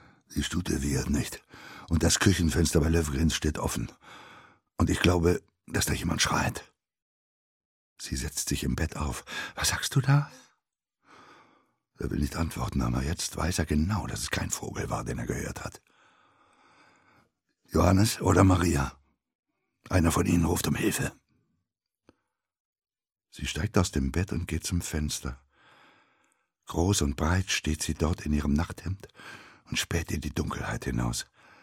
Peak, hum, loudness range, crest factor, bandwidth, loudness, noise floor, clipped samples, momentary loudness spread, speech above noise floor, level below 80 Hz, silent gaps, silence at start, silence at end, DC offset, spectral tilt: -6 dBFS; none; 7 LU; 24 dB; 16.5 kHz; -28 LUFS; -84 dBFS; under 0.1%; 14 LU; 56 dB; -40 dBFS; 7.02-7.96 s, 19.35-19.43 s, 22.60-22.73 s; 0.3 s; 0.4 s; under 0.1%; -4.5 dB/octave